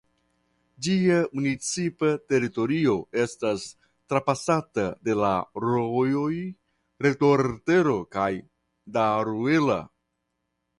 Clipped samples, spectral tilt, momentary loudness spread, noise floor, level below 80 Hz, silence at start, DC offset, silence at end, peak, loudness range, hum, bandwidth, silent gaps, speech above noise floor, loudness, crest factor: under 0.1%; -6 dB/octave; 8 LU; -78 dBFS; -60 dBFS; 0.8 s; under 0.1%; 0.95 s; -8 dBFS; 2 LU; none; 11.5 kHz; none; 54 dB; -25 LUFS; 18 dB